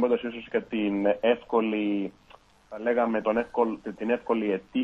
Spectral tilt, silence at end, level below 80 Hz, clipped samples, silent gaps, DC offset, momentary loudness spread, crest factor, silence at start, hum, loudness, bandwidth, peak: -7.5 dB/octave; 0 s; -62 dBFS; under 0.1%; none; under 0.1%; 7 LU; 18 dB; 0 s; none; -27 LUFS; 6 kHz; -10 dBFS